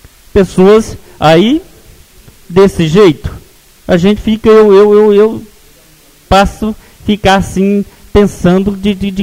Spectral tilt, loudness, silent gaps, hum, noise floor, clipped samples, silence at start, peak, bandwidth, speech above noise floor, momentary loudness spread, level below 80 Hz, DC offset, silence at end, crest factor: -6.5 dB/octave; -9 LUFS; none; none; -42 dBFS; 1%; 0.35 s; 0 dBFS; 16 kHz; 34 dB; 13 LU; -28 dBFS; under 0.1%; 0 s; 10 dB